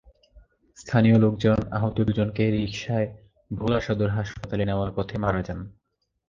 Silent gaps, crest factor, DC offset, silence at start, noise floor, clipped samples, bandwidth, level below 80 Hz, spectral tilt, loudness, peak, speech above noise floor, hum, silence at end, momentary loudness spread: none; 18 dB; under 0.1%; 0.35 s; -55 dBFS; under 0.1%; 7.4 kHz; -44 dBFS; -8 dB/octave; -25 LUFS; -6 dBFS; 32 dB; none; 0.6 s; 13 LU